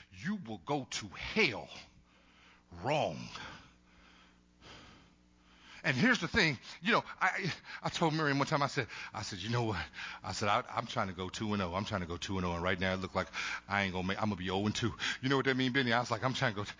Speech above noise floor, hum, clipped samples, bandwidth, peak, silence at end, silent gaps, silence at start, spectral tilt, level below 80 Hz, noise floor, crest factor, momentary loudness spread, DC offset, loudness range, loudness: 30 dB; none; under 0.1%; 7.6 kHz; -14 dBFS; 0.05 s; none; 0 s; -4.5 dB/octave; -58 dBFS; -64 dBFS; 22 dB; 12 LU; under 0.1%; 9 LU; -34 LUFS